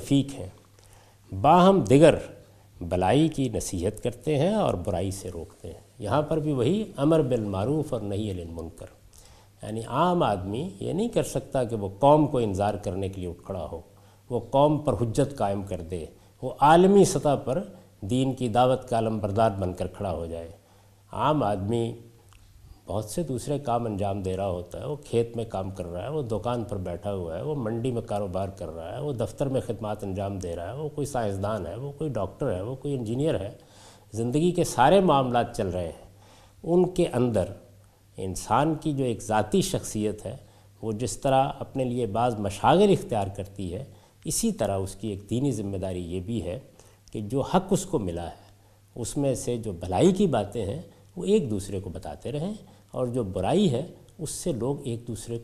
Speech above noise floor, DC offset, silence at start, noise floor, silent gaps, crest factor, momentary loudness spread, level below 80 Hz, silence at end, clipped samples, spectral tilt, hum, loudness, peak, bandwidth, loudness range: 31 dB; under 0.1%; 0 s; -56 dBFS; none; 22 dB; 16 LU; -50 dBFS; 0 s; under 0.1%; -6 dB/octave; none; -26 LUFS; -4 dBFS; 14.5 kHz; 8 LU